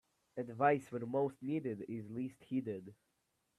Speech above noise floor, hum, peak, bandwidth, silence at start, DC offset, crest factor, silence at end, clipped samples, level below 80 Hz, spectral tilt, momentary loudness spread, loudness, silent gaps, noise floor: 44 dB; none; -18 dBFS; 13 kHz; 0.35 s; under 0.1%; 22 dB; 0.65 s; under 0.1%; -80 dBFS; -8 dB/octave; 14 LU; -39 LUFS; none; -82 dBFS